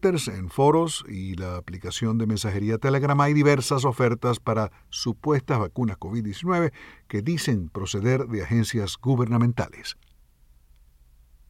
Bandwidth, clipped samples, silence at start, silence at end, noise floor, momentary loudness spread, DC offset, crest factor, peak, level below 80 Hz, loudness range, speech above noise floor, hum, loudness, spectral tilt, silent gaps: 15 kHz; under 0.1%; 0.05 s; 1.55 s; -56 dBFS; 12 LU; under 0.1%; 18 dB; -6 dBFS; -50 dBFS; 4 LU; 32 dB; none; -25 LUFS; -6 dB/octave; none